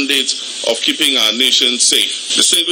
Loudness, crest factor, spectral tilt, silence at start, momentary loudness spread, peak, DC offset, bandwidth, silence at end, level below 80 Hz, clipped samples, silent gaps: -12 LUFS; 14 dB; 1 dB/octave; 0 s; 7 LU; 0 dBFS; under 0.1%; over 20 kHz; 0 s; -68 dBFS; under 0.1%; none